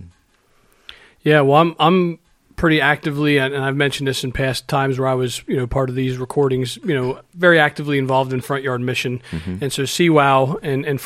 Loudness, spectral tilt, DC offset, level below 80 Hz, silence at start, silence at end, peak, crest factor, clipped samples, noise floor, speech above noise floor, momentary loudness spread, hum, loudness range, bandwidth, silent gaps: -18 LUFS; -5.5 dB/octave; under 0.1%; -44 dBFS; 0 s; 0 s; 0 dBFS; 18 dB; under 0.1%; -58 dBFS; 40 dB; 9 LU; none; 3 LU; 15.5 kHz; none